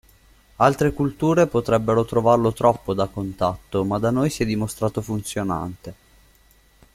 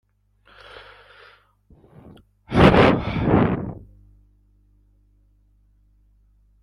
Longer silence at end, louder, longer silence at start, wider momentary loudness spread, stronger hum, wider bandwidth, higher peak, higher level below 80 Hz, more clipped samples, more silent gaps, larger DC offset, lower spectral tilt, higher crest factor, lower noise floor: second, 1 s vs 2.85 s; second, -21 LUFS vs -18 LUFS; second, 0.6 s vs 2.5 s; second, 9 LU vs 29 LU; second, none vs 50 Hz at -45 dBFS; first, 16 kHz vs 11 kHz; about the same, -2 dBFS vs -2 dBFS; second, -46 dBFS vs -40 dBFS; neither; neither; neither; second, -6.5 dB/octave vs -8 dB/octave; about the same, 20 dB vs 22 dB; about the same, -56 dBFS vs -59 dBFS